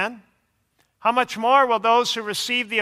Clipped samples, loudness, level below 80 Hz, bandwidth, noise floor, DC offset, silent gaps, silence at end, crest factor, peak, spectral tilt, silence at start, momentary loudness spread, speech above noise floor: under 0.1%; -20 LUFS; -72 dBFS; 15.5 kHz; -68 dBFS; under 0.1%; none; 0 s; 18 dB; -4 dBFS; -2 dB/octave; 0 s; 8 LU; 48 dB